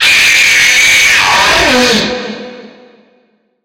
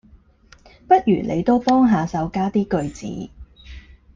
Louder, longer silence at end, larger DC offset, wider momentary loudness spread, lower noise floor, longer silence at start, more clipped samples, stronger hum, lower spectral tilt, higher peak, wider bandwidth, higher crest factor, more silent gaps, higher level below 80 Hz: first, -6 LUFS vs -19 LUFS; first, 0.95 s vs 0.35 s; neither; about the same, 14 LU vs 15 LU; about the same, -54 dBFS vs -51 dBFS; second, 0 s vs 0.9 s; neither; neither; second, -0.5 dB/octave vs -7.5 dB/octave; about the same, 0 dBFS vs -2 dBFS; first, 17 kHz vs 7.6 kHz; second, 10 dB vs 18 dB; neither; first, -38 dBFS vs -46 dBFS